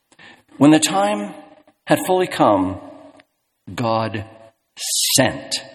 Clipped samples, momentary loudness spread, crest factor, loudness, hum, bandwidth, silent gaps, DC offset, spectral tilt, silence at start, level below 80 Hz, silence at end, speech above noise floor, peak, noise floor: under 0.1%; 18 LU; 20 dB; -18 LUFS; none; 19 kHz; none; under 0.1%; -3.5 dB/octave; 0.25 s; -58 dBFS; 0.05 s; 38 dB; 0 dBFS; -56 dBFS